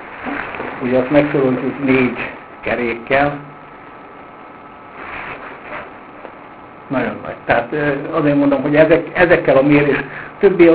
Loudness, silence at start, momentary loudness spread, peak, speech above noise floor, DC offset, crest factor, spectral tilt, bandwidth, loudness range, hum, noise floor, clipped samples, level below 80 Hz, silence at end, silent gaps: -16 LUFS; 0 s; 25 LU; 0 dBFS; 23 dB; under 0.1%; 16 dB; -10.5 dB/octave; 4 kHz; 14 LU; none; -37 dBFS; under 0.1%; -46 dBFS; 0 s; none